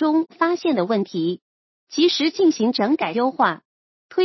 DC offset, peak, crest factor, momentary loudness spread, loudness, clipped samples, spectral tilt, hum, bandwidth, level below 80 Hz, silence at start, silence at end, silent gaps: under 0.1%; -4 dBFS; 16 dB; 9 LU; -20 LUFS; under 0.1%; -5 dB/octave; none; 6.2 kHz; -74 dBFS; 0 s; 0 s; 1.42-1.87 s, 3.65-4.09 s